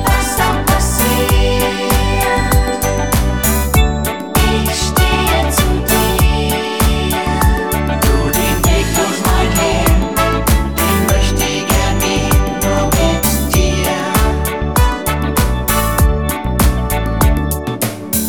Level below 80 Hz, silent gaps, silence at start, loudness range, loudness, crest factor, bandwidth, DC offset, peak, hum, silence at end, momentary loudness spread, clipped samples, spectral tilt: -18 dBFS; none; 0 s; 1 LU; -14 LUFS; 14 dB; 19.5 kHz; 1%; 0 dBFS; none; 0 s; 3 LU; under 0.1%; -4.5 dB/octave